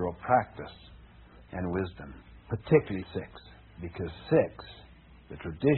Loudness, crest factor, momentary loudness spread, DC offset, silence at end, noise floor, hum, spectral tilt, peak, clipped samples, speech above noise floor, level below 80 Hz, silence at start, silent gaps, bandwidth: -30 LUFS; 22 dB; 23 LU; under 0.1%; 0 s; -53 dBFS; none; -6.5 dB/octave; -8 dBFS; under 0.1%; 23 dB; -52 dBFS; 0 s; none; 4.3 kHz